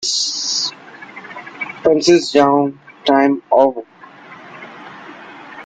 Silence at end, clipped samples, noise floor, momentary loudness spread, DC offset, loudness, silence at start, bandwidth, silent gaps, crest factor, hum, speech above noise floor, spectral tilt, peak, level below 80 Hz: 0 s; under 0.1%; -39 dBFS; 23 LU; under 0.1%; -15 LUFS; 0 s; 9.4 kHz; none; 18 dB; none; 26 dB; -3 dB/octave; 0 dBFS; -60 dBFS